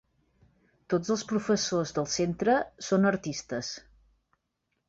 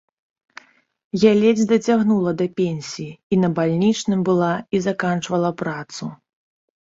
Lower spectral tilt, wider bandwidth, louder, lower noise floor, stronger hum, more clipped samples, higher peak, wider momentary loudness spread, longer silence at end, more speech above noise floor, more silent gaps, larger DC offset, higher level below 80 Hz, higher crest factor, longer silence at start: second, -4.5 dB/octave vs -6.5 dB/octave; about the same, 7.8 kHz vs 7.8 kHz; second, -29 LUFS vs -19 LUFS; first, -80 dBFS vs -46 dBFS; neither; neither; second, -12 dBFS vs -2 dBFS; second, 9 LU vs 13 LU; first, 1.1 s vs 0.75 s; first, 52 dB vs 27 dB; second, none vs 3.23-3.30 s; neither; about the same, -62 dBFS vs -60 dBFS; about the same, 18 dB vs 18 dB; second, 0.9 s vs 1.15 s